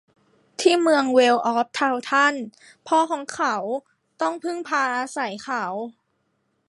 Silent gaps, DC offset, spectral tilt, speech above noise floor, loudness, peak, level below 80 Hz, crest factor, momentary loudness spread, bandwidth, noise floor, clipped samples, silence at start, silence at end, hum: none; under 0.1%; -3 dB/octave; 49 dB; -22 LUFS; -4 dBFS; -78 dBFS; 20 dB; 14 LU; 11.5 kHz; -71 dBFS; under 0.1%; 0.6 s; 0.75 s; none